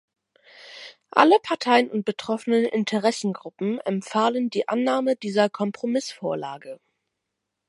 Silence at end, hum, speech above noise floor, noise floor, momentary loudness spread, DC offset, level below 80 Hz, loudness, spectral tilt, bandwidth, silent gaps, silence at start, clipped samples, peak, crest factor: 0.95 s; none; 59 dB; -81 dBFS; 15 LU; under 0.1%; -76 dBFS; -23 LUFS; -5 dB/octave; 11.5 kHz; none; 0.6 s; under 0.1%; 0 dBFS; 24 dB